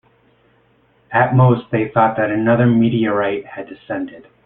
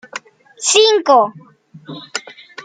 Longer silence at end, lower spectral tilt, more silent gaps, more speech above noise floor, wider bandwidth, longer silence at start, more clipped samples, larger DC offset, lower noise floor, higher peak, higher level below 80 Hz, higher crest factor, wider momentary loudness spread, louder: first, 0.25 s vs 0.05 s; first, -12.5 dB/octave vs -1 dB/octave; neither; first, 40 dB vs 21 dB; second, 3.9 kHz vs 9.6 kHz; first, 1.1 s vs 0.15 s; neither; neither; first, -56 dBFS vs -34 dBFS; about the same, -2 dBFS vs 0 dBFS; first, -52 dBFS vs -76 dBFS; about the same, 16 dB vs 16 dB; second, 14 LU vs 23 LU; second, -16 LUFS vs -13 LUFS